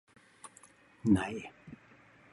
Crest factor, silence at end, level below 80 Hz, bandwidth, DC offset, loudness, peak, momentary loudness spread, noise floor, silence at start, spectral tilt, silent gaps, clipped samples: 22 dB; 0.6 s; -58 dBFS; 11.5 kHz; under 0.1%; -32 LUFS; -14 dBFS; 24 LU; -60 dBFS; 0.45 s; -6.5 dB/octave; none; under 0.1%